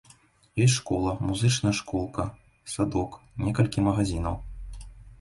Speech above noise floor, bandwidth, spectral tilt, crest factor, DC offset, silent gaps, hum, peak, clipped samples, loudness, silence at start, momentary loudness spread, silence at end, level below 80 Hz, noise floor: 32 dB; 11.5 kHz; -5.5 dB/octave; 18 dB; under 0.1%; none; none; -8 dBFS; under 0.1%; -27 LUFS; 0.55 s; 17 LU; 0.05 s; -42 dBFS; -58 dBFS